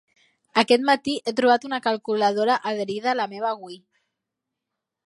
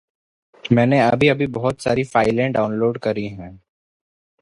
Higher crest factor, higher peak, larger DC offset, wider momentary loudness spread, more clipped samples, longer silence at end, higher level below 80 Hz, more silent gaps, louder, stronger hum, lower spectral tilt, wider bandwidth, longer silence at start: about the same, 20 dB vs 18 dB; about the same, -2 dBFS vs -2 dBFS; neither; second, 9 LU vs 12 LU; neither; first, 1.3 s vs 0.85 s; second, -72 dBFS vs -50 dBFS; neither; second, -22 LUFS vs -18 LUFS; neither; second, -4 dB/octave vs -7 dB/octave; about the same, 11.5 kHz vs 11.5 kHz; about the same, 0.55 s vs 0.65 s